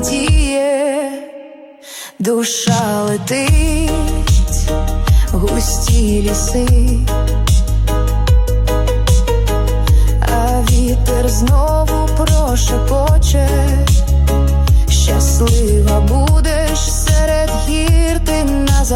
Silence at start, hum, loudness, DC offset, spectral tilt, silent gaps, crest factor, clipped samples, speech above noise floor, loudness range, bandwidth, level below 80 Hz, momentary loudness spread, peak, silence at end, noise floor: 0 s; none; -14 LUFS; under 0.1%; -5 dB/octave; none; 10 dB; under 0.1%; 24 dB; 3 LU; 16.5 kHz; -14 dBFS; 4 LU; -2 dBFS; 0 s; -36 dBFS